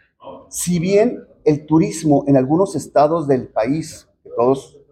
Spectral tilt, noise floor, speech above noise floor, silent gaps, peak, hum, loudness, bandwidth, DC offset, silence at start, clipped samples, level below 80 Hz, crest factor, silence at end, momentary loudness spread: -6.5 dB/octave; -39 dBFS; 23 dB; none; -4 dBFS; none; -17 LUFS; 16 kHz; under 0.1%; 0.25 s; under 0.1%; -52 dBFS; 14 dB; 0.25 s; 9 LU